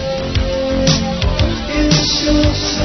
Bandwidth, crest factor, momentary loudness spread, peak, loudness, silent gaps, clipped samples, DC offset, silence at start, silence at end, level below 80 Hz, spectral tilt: 6.4 kHz; 14 dB; 5 LU; 0 dBFS; -15 LUFS; none; under 0.1%; 0.5%; 0 s; 0 s; -22 dBFS; -4.5 dB/octave